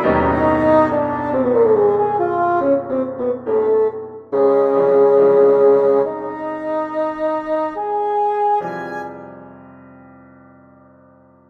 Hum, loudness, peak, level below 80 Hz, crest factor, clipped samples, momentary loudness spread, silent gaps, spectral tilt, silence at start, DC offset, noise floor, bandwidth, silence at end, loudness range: none; -17 LUFS; -4 dBFS; -46 dBFS; 14 dB; under 0.1%; 13 LU; none; -9 dB/octave; 0 s; under 0.1%; -49 dBFS; 4.6 kHz; 1.8 s; 8 LU